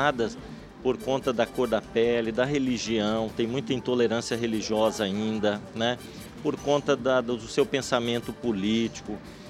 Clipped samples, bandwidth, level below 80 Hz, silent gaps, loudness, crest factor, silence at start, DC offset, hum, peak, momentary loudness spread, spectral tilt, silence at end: under 0.1%; 15 kHz; -54 dBFS; none; -27 LUFS; 20 dB; 0 s; under 0.1%; none; -8 dBFS; 7 LU; -5 dB/octave; 0 s